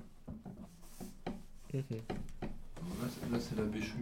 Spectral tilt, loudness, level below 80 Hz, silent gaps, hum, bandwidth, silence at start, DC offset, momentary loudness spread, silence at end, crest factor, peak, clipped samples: -6.5 dB/octave; -43 LUFS; -52 dBFS; none; none; 16.5 kHz; 0 s; under 0.1%; 14 LU; 0 s; 18 dB; -24 dBFS; under 0.1%